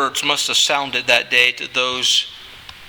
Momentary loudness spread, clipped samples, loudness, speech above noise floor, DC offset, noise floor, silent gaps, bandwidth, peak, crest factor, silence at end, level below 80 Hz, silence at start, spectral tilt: 6 LU; under 0.1%; -15 LUFS; 20 dB; under 0.1%; -38 dBFS; none; over 20 kHz; 0 dBFS; 18 dB; 0 s; -56 dBFS; 0 s; 0 dB/octave